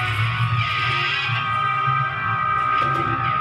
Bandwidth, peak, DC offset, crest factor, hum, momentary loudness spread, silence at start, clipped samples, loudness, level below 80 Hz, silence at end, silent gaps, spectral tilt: 12 kHz; -8 dBFS; under 0.1%; 12 dB; none; 2 LU; 0 s; under 0.1%; -20 LUFS; -46 dBFS; 0 s; none; -5.5 dB/octave